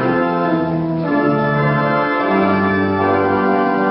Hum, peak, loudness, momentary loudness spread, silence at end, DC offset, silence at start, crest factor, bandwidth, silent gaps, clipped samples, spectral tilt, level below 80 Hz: none; -4 dBFS; -16 LUFS; 3 LU; 0 s; under 0.1%; 0 s; 12 dB; 5.6 kHz; none; under 0.1%; -12.5 dB/octave; -50 dBFS